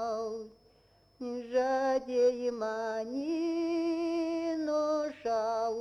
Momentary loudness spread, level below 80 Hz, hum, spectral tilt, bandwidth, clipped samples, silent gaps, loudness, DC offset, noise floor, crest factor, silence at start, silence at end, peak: 11 LU; -70 dBFS; none; -4.5 dB/octave; 11 kHz; under 0.1%; none; -32 LUFS; under 0.1%; -65 dBFS; 14 dB; 0 s; 0 s; -18 dBFS